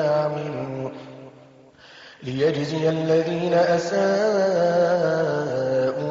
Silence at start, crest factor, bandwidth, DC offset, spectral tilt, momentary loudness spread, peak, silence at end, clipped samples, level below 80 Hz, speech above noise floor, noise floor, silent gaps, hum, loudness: 0 s; 12 dB; 7.6 kHz; under 0.1%; -5.5 dB/octave; 12 LU; -10 dBFS; 0 s; under 0.1%; -62 dBFS; 29 dB; -49 dBFS; none; none; -22 LUFS